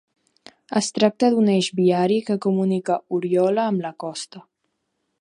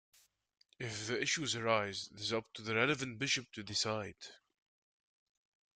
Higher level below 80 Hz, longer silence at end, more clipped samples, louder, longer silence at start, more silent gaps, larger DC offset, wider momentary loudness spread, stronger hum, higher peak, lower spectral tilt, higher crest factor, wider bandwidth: about the same, -72 dBFS vs -76 dBFS; second, 0.8 s vs 1.4 s; neither; first, -21 LUFS vs -36 LUFS; about the same, 0.7 s vs 0.8 s; neither; neither; about the same, 12 LU vs 11 LU; neither; first, -4 dBFS vs -18 dBFS; first, -5.5 dB/octave vs -3 dB/octave; about the same, 18 dB vs 22 dB; about the same, 11 kHz vs 12 kHz